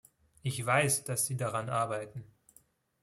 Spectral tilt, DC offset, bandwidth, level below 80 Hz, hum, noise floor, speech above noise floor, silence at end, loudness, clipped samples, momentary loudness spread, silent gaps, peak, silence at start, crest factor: -3.5 dB/octave; under 0.1%; 15.5 kHz; -68 dBFS; none; -66 dBFS; 34 dB; 0.8 s; -31 LUFS; under 0.1%; 13 LU; none; -12 dBFS; 0.45 s; 22 dB